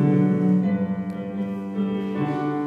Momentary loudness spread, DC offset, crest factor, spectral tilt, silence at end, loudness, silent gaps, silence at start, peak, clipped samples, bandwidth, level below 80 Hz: 9 LU; under 0.1%; 14 dB; -10 dB/octave; 0 s; -24 LUFS; none; 0 s; -8 dBFS; under 0.1%; 4.3 kHz; -64 dBFS